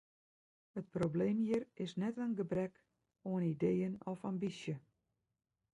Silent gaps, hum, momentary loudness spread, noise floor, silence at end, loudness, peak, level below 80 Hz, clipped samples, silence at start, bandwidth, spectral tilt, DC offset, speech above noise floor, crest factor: none; none; 10 LU; -86 dBFS; 0.95 s; -39 LUFS; -24 dBFS; -74 dBFS; under 0.1%; 0.75 s; 11 kHz; -8 dB/octave; under 0.1%; 48 dB; 16 dB